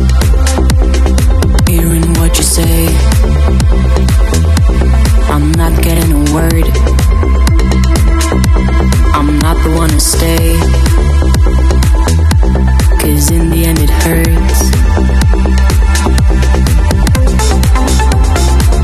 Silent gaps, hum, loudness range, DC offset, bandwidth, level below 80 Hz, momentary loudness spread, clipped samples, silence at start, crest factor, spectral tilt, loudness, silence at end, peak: none; none; 0 LU; under 0.1%; 14 kHz; -10 dBFS; 1 LU; under 0.1%; 0 s; 8 dB; -5.5 dB/octave; -10 LUFS; 0 s; 0 dBFS